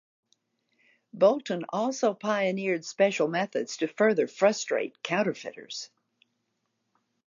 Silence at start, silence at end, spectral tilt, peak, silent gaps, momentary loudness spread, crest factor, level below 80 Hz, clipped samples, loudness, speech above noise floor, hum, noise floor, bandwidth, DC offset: 1.15 s; 1.4 s; -4.5 dB/octave; -10 dBFS; none; 14 LU; 20 dB; -82 dBFS; under 0.1%; -27 LUFS; 51 dB; none; -78 dBFS; 7.6 kHz; under 0.1%